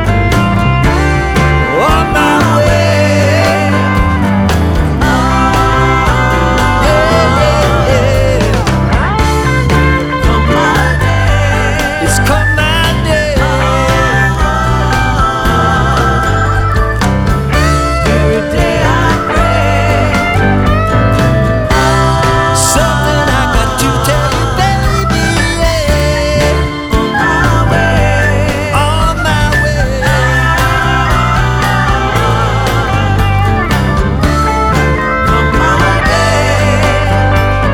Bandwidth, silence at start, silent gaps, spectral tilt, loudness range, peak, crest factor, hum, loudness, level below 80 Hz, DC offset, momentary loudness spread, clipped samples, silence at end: 17.5 kHz; 0 s; none; -5.5 dB/octave; 1 LU; 0 dBFS; 10 dB; none; -10 LUFS; -16 dBFS; under 0.1%; 2 LU; under 0.1%; 0 s